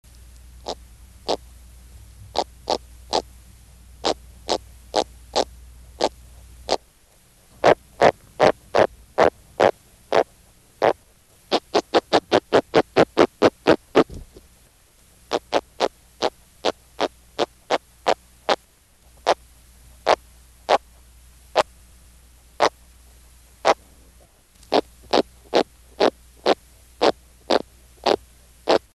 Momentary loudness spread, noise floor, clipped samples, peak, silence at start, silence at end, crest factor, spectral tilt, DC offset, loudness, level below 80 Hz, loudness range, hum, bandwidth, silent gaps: 10 LU; -55 dBFS; under 0.1%; -4 dBFS; 0.7 s; 0.15 s; 20 dB; -4 dB/octave; under 0.1%; -23 LUFS; -50 dBFS; 8 LU; none; 13 kHz; none